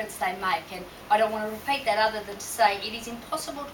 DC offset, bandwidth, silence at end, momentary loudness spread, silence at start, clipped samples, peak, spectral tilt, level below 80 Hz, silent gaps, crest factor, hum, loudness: under 0.1%; 19.5 kHz; 0 s; 10 LU; 0 s; under 0.1%; -8 dBFS; -2.5 dB/octave; -58 dBFS; none; 20 dB; none; -27 LUFS